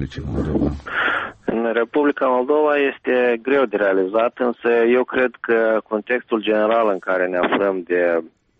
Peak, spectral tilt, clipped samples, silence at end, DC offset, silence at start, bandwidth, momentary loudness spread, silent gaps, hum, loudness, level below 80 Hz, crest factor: -6 dBFS; -7.5 dB/octave; under 0.1%; 0.3 s; under 0.1%; 0 s; 6.8 kHz; 5 LU; none; none; -19 LUFS; -42 dBFS; 12 dB